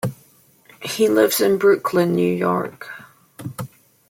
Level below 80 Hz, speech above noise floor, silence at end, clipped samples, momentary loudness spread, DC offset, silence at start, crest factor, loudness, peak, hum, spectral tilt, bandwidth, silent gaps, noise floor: -64 dBFS; 36 dB; 0.45 s; under 0.1%; 20 LU; under 0.1%; 0.05 s; 16 dB; -18 LUFS; -4 dBFS; none; -5 dB/octave; 16.5 kHz; none; -54 dBFS